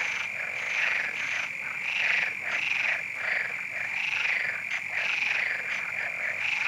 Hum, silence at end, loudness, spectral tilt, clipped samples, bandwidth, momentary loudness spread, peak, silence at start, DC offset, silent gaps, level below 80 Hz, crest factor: none; 0 s; -27 LUFS; -0.5 dB/octave; under 0.1%; 16 kHz; 5 LU; -12 dBFS; 0 s; under 0.1%; none; -78 dBFS; 16 dB